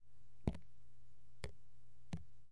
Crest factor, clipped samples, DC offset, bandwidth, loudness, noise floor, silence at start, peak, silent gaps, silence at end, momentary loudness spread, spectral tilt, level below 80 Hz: 30 dB; under 0.1%; 0.5%; 11 kHz; -50 LUFS; -70 dBFS; 0 s; -20 dBFS; none; 0 s; 12 LU; -7 dB/octave; -58 dBFS